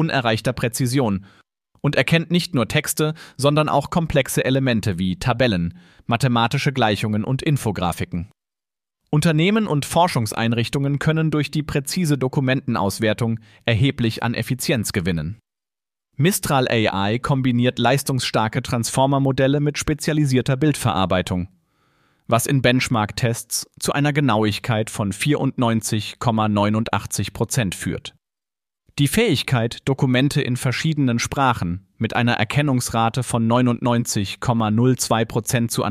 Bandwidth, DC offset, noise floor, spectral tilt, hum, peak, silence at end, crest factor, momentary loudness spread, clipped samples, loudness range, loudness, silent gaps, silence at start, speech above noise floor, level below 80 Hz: 15.5 kHz; under 0.1%; under -90 dBFS; -5 dB/octave; none; -2 dBFS; 0 s; 18 dB; 6 LU; under 0.1%; 2 LU; -20 LUFS; none; 0 s; over 70 dB; -46 dBFS